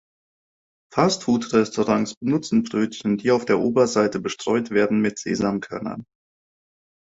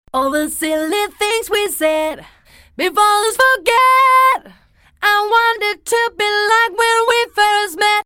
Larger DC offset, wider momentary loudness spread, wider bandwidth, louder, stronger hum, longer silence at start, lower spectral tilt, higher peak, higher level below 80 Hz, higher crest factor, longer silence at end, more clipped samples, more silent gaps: neither; about the same, 8 LU vs 8 LU; second, 8 kHz vs over 20 kHz; second, -22 LUFS vs -14 LUFS; neither; first, 0.9 s vs 0.15 s; first, -5.5 dB/octave vs -0.5 dB/octave; about the same, -4 dBFS vs -2 dBFS; second, -58 dBFS vs -52 dBFS; first, 20 dB vs 14 dB; first, 1 s vs 0.05 s; neither; first, 2.17-2.21 s vs none